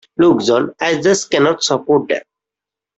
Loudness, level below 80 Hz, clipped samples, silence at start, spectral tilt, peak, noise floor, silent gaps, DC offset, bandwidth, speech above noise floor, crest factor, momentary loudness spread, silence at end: -15 LUFS; -56 dBFS; under 0.1%; 0.2 s; -4 dB/octave; -2 dBFS; -86 dBFS; none; under 0.1%; 8.2 kHz; 72 dB; 14 dB; 5 LU; 0.75 s